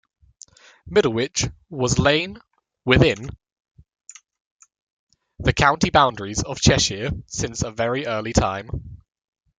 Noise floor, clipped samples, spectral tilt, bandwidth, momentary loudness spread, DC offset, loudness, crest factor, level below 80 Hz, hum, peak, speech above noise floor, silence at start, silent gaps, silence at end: -49 dBFS; under 0.1%; -4 dB/octave; 9.6 kHz; 13 LU; under 0.1%; -21 LUFS; 22 dB; -38 dBFS; none; 0 dBFS; 29 dB; 0.85 s; 3.52-3.56 s, 3.71-3.75 s, 4.41-4.59 s, 4.82-5.07 s; 0.65 s